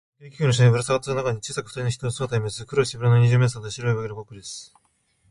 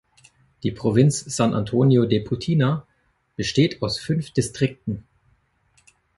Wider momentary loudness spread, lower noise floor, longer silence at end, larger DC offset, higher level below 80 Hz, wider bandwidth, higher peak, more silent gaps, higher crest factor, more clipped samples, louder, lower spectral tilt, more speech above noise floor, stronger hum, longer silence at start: first, 17 LU vs 12 LU; about the same, -66 dBFS vs -66 dBFS; second, 0.65 s vs 1.15 s; neither; about the same, -52 dBFS vs -50 dBFS; about the same, 11.5 kHz vs 11.5 kHz; about the same, -6 dBFS vs -4 dBFS; neither; about the same, 18 dB vs 18 dB; neither; about the same, -23 LUFS vs -22 LUFS; about the same, -5.5 dB/octave vs -6 dB/octave; about the same, 44 dB vs 46 dB; neither; second, 0.2 s vs 0.65 s